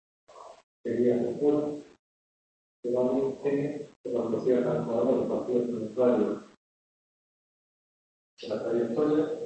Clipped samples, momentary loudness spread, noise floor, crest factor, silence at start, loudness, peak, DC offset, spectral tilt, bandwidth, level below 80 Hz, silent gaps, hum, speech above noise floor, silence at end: under 0.1%; 10 LU; under -90 dBFS; 16 dB; 0.3 s; -28 LUFS; -12 dBFS; under 0.1%; -8 dB/octave; 8.6 kHz; -70 dBFS; 0.63-0.84 s, 1.99-2.83 s, 3.96-4.04 s, 6.57-8.37 s; none; over 63 dB; 0 s